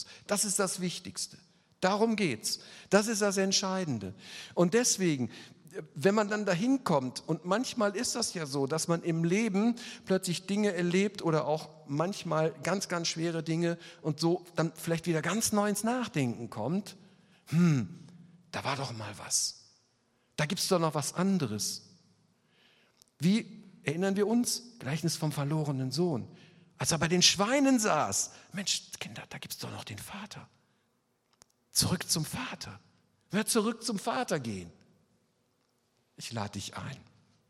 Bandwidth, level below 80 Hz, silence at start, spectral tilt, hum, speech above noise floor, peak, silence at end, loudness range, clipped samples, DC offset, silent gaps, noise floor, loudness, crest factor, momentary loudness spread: 16 kHz; -68 dBFS; 0 s; -4 dB/octave; none; 44 dB; -8 dBFS; 0.5 s; 6 LU; under 0.1%; under 0.1%; none; -75 dBFS; -30 LUFS; 24 dB; 14 LU